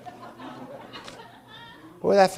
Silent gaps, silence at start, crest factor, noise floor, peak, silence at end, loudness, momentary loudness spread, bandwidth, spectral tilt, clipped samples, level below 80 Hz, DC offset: none; 0.05 s; 22 dB; -46 dBFS; -6 dBFS; 0 s; -26 LUFS; 23 LU; 15.5 kHz; -5 dB/octave; under 0.1%; -66 dBFS; under 0.1%